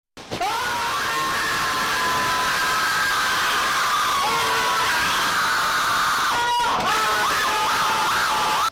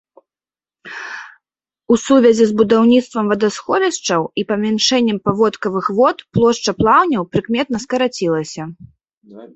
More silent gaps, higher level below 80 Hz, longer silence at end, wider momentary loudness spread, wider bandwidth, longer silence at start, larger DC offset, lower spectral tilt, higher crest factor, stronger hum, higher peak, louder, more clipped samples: second, none vs 9.17-9.21 s; about the same, -50 dBFS vs -50 dBFS; about the same, 0 s vs 0.1 s; second, 3 LU vs 16 LU; first, 17 kHz vs 8.2 kHz; second, 0.15 s vs 0.85 s; neither; second, -1 dB/octave vs -4.5 dB/octave; second, 10 dB vs 16 dB; neither; second, -12 dBFS vs 0 dBFS; second, -20 LUFS vs -15 LUFS; neither